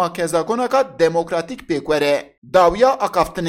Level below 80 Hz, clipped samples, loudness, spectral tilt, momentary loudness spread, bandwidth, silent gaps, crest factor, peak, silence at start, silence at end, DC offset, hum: -44 dBFS; under 0.1%; -18 LUFS; -5 dB/octave; 9 LU; 16 kHz; 2.38-2.42 s; 14 dB; -4 dBFS; 0 s; 0 s; under 0.1%; none